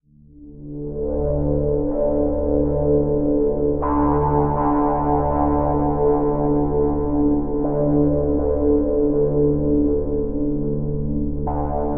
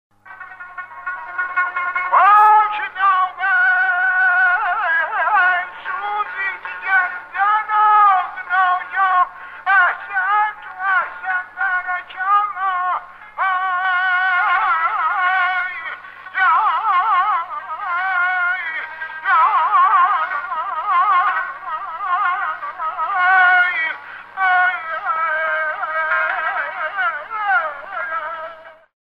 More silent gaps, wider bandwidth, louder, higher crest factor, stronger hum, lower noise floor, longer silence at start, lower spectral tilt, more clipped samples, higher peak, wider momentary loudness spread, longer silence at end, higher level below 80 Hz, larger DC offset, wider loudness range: neither; second, 2.5 kHz vs 5.6 kHz; second, -20 LUFS vs -17 LUFS; about the same, 14 dB vs 14 dB; neither; first, -44 dBFS vs -38 dBFS; second, 0 s vs 0.25 s; first, -8.5 dB/octave vs -2.5 dB/octave; neither; about the same, -4 dBFS vs -4 dBFS; second, 6 LU vs 12 LU; second, 0 s vs 0.3 s; first, -28 dBFS vs -64 dBFS; first, 3% vs under 0.1%; second, 2 LU vs 5 LU